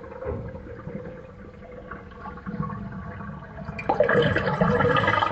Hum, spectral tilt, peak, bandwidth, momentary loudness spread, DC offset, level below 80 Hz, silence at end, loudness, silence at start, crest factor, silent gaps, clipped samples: none; -7.5 dB/octave; -8 dBFS; 8.2 kHz; 20 LU; under 0.1%; -44 dBFS; 0 s; -24 LUFS; 0 s; 20 dB; none; under 0.1%